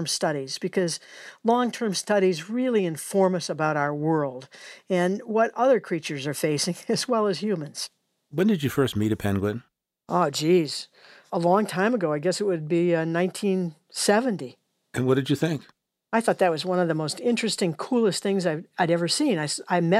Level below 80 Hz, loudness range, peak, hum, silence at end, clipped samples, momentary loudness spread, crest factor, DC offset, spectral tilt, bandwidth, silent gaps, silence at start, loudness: -64 dBFS; 2 LU; -6 dBFS; none; 0 s; under 0.1%; 9 LU; 18 dB; under 0.1%; -5 dB/octave; 16 kHz; none; 0 s; -25 LUFS